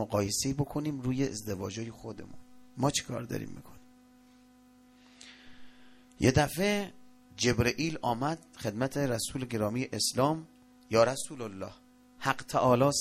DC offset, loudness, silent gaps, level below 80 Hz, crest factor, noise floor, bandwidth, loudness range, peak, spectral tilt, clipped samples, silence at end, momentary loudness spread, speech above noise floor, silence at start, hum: under 0.1%; -31 LUFS; none; -54 dBFS; 22 dB; -59 dBFS; 16 kHz; 8 LU; -10 dBFS; -4.5 dB/octave; under 0.1%; 0 s; 18 LU; 29 dB; 0 s; 50 Hz at -60 dBFS